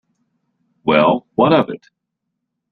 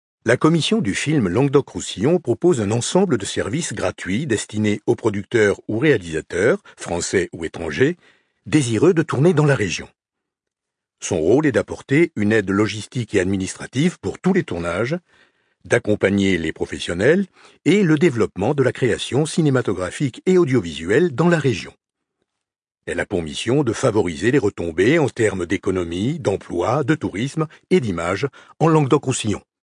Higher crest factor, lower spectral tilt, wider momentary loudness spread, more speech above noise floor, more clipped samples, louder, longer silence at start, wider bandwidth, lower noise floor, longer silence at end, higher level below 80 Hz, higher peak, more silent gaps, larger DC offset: about the same, 18 dB vs 18 dB; first, -9 dB/octave vs -5.5 dB/octave; first, 11 LU vs 8 LU; about the same, 62 dB vs 65 dB; neither; first, -16 LUFS vs -20 LUFS; first, 0.85 s vs 0.25 s; second, 5.8 kHz vs 10.5 kHz; second, -77 dBFS vs -84 dBFS; first, 0.95 s vs 0.3 s; about the same, -58 dBFS vs -54 dBFS; about the same, -2 dBFS vs -2 dBFS; neither; neither